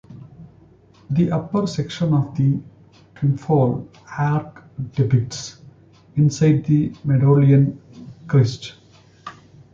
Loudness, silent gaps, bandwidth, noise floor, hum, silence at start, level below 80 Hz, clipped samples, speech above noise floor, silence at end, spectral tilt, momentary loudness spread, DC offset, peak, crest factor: -19 LUFS; none; 7.4 kHz; -50 dBFS; none; 0.1 s; -52 dBFS; under 0.1%; 32 dB; 0.4 s; -7.5 dB/octave; 21 LU; under 0.1%; -4 dBFS; 16 dB